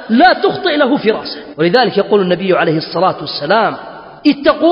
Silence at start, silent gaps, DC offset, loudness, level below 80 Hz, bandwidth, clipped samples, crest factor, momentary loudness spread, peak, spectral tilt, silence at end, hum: 0 s; none; under 0.1%; -13 LUFS; -52 dBFS; 5.6 kHz; under 0.1%; 12 dB; 9 LU; 0 dBFS; -8 dB/octave; 0 s; none